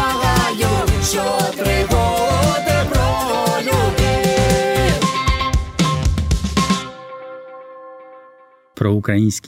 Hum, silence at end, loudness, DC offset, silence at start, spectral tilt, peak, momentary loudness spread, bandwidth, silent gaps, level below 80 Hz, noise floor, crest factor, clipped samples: none; 0.1 s; -17 LUFS; under 0.1%; 0 s; -5 dB/octave; 0 dBFS; 17 LU; 16.5 kHz; none; -26 dBFS; -48 dBFS; 16 dB; under 0.1%